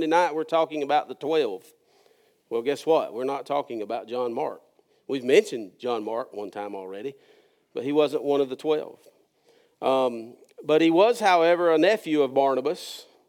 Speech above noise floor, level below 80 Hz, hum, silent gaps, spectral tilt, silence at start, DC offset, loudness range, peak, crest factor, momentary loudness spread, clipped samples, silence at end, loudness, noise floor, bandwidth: 38 dB; under -90 dBFS; none; none; -4.5 dB/octave; 0 s; under 0.1%; 7 LU; -6 dBFS; 20 dB; 15 LU; under 0.1%; 0.25 s; -25 LUFS; -63 dBFS; 16.5 kHz